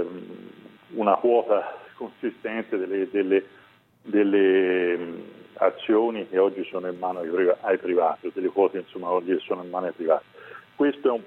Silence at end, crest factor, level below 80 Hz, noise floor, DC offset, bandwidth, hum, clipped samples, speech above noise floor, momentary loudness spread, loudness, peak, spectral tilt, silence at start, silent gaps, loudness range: 0 s; 20 dB; -76 dBFS; -47 dBFS; under 0.1%; 4.1 kHz; none; under 0.1%; 23 dB; 16 LU; -24 LUFS; -4 dBFS; -8 dB/octave; 0 s; none; 2 LU